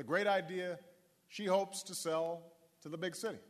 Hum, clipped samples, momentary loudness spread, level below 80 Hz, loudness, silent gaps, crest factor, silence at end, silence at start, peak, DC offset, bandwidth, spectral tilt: none; under 0.1%; 16 LU; -88 dBFS; -38 LUFS; none; 20 dB; 0.05 s; 0 s; -18 dBFS; under 0.1%; 13.5 kHz; -3.5 dB/octave